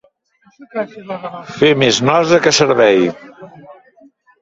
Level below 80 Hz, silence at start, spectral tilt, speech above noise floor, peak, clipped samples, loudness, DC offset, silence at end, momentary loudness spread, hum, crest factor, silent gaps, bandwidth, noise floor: -54 dBFS; 0.6 s; -4 dB/octave; 41 dB; 0 dBFS; under 0.1%; -13 LUFS; under 0.1%; 0.7 s; 16 LU; none; 16 dB; none; 8 kHz; -55 dBFS